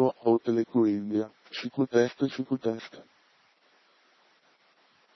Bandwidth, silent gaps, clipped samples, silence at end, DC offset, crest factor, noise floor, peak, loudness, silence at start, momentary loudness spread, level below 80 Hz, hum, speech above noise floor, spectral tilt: 6.2 kHz; none; under 0.1%; 2.15 s; under 0.1%; 20 dB; -65 dBFS; -10 dBFS; -28 LUFS; 0 s; 12 LU; -78 dBFS; none; 37 dB; -7 dB/octave